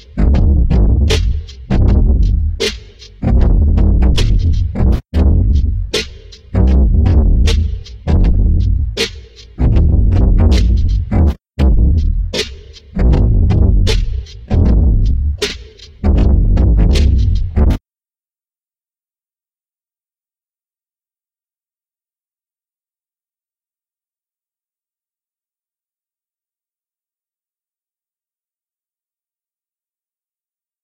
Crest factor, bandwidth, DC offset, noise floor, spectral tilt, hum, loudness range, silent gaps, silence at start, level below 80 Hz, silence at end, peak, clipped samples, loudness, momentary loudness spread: 14 dB; 9.8 kHz; under 0.1%; under -90 dBFS; -6.5 dB/octave; none; 1 LU; none; 0.15 s; -16 dBFS; 13.05 s; 0 dBFS; under 0.1%; -14 LUFS; 8 LU